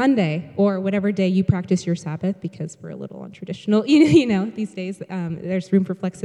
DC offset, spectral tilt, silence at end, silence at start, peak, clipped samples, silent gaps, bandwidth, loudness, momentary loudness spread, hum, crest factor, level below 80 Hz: under 0.1%; -7 dB/octave; 0 s; 0 s; -4 dBFS; under 0.1%; none; 11 kHz; -21 LUFS; 18 LU; none; 18 dB; -56 dBFS